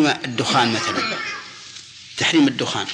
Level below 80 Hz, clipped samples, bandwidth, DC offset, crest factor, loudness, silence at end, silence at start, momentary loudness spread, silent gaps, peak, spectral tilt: -62 dBFS; under 0.1%; 10.5 kHz; under 0.1%; 16 dB; -19 LUFS; 0 s; 0 s; 19 LU; none; -4 dBFS; -3.5 dB/octave